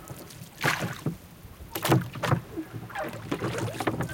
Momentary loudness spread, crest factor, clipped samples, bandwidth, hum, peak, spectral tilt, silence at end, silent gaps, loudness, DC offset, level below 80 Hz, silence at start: 17 LU; 22 dB; under 0.1%; 17 kHz; none; -8 dBFS; -5 dB/octave; 0 s; none; -30 LUFS; under 0.1%; -54 dBFS; 0 s